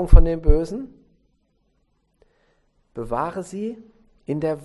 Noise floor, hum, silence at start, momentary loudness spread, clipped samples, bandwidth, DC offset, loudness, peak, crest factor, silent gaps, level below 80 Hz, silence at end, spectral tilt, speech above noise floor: -67 dBFS; none; 0 s; 22 LU; 0.3%; 8.2 kHz; under 0.1%; -24 LUFS; 0 dBFS; 20 dB; none; -22 dBFS; 0.05 s; -8.5 dB/octave; 50 dB